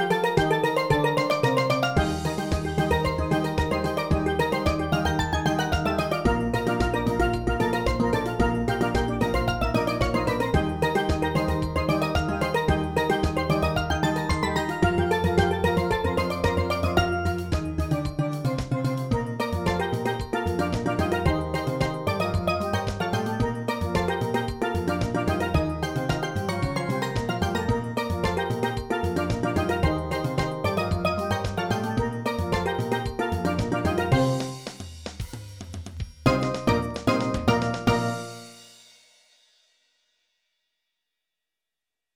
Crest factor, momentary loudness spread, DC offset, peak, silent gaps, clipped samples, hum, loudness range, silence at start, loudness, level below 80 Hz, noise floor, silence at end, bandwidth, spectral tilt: 20 dB; 5 LU; under 0.1%; -6 dBFS; none; under 0.1%; none; 3 LU; 0 s; -25 LUFS; -38 dBFS; -88 dBFS; 3.45 s; 19.5 kHz; -6 dB/octave